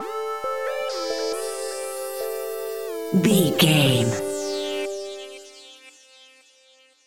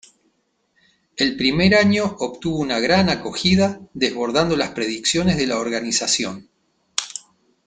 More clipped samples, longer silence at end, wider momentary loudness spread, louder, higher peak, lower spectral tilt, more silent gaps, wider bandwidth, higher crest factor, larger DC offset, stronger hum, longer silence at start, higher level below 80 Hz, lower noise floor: neither; first, 0.75 s vs 0.5 s; first, 19 LU vs 11 LU; second, -23 LUFS vs -19 LUFS; second, -4 dBFS vs 0 dBFS; about the same, -4.5 dB/octave vs -4 dB/octave; neither; first, 17 kHz vs 9.6 kHz; about the same, 20 dB vs 20 dB; first, 0.3% vs under 0.1%; neither; second, 0 s vs 1.15 s; second, -64 dBFS vs -48 dBFS; second, -57 dBFS vs -67 dBFS